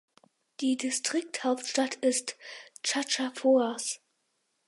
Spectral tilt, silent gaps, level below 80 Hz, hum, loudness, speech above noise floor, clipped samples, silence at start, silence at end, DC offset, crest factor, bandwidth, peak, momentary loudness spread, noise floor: -1 dB/octave; none; -86 dBFS; none; -29 LUFS; 48 dB; under 0.1%; 0.6 s; 0.7 s; under 0.1%; 16 dB; 11.5 kHz; -14 dBFS; 12 LU; -77 dBFS